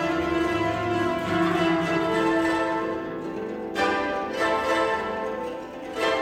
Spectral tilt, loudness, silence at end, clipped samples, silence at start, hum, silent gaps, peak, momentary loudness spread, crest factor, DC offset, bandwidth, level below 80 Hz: -5.5 dB/octave; -25 LUFS; 0 s; under 0.1%; 0 s; none; none; -10 dBFS; 9 LU; 14 dB; under 0.1%; 14 kHz; -52 dBFS